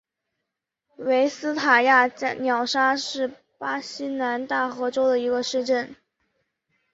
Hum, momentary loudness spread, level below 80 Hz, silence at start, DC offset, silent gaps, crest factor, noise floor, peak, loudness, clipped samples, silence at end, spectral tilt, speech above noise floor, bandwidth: none; 12 LU; -72 dBFS; 1 s; under 0.1%; none; 20 dB; -83 dBFS; -4 dBFS; -23 LUFS; under 0.1%; 1 s; -2.5 dB/octave; 60 dB; 8 kHz